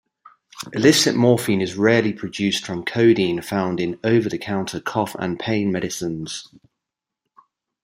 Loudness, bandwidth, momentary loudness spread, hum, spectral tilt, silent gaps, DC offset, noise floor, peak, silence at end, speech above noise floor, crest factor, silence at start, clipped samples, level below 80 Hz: -20 LUFS; 16 kHz; 11 LU; none; -5 dB/octave; none; under 0.1%; -84 dBFS; -2 dBFS; 1.4 s; 64 dB; 20 dB; 0.55 s; under 0.1%; -60 dBFS